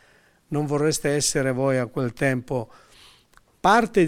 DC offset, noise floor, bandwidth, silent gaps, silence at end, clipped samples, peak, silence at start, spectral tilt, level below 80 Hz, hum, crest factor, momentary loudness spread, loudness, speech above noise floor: under 0.1%; -58 dBFS; 16.5 kHz; none; 0 s; under 0.1%; -6 dBFS; 0.5 s; -4.5 dB/octave; -52 dBFS; none; 18 dB; 11 LU; -23 LUFS; 36 dB